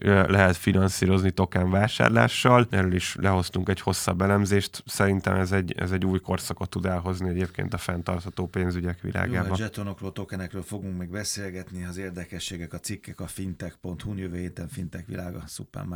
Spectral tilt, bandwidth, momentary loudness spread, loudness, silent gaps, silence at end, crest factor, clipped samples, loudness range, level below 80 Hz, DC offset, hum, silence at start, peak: -5.5 dB/octave; 19 kHz; 15 LU; -26 LUFS; none; 0 s; 24 dB; under 0.1%; 12 LU; -54 dBFS; under 0.1%; none; 0 s; -2 dBFS